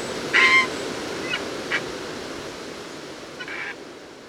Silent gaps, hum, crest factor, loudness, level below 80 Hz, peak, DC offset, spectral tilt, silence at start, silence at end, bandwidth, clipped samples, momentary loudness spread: none; none; 22 dB; -22 LUFS; -58 dBFS; -4 dBFS; under 0.1%; -2 dB/octave; 0 s; 0 s; 17.5 kHz; under 0.1%; 21 LU